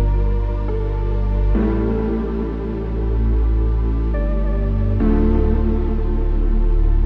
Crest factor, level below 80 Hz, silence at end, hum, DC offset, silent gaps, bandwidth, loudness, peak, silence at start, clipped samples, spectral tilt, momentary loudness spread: 12 dB; -18 dBFS; 0 s; none; under 0.1%; none; 4 kHz; -20 LUFS; -4 dBFS; 0 s; under 0.1%; -11 dB/octave; 5 LU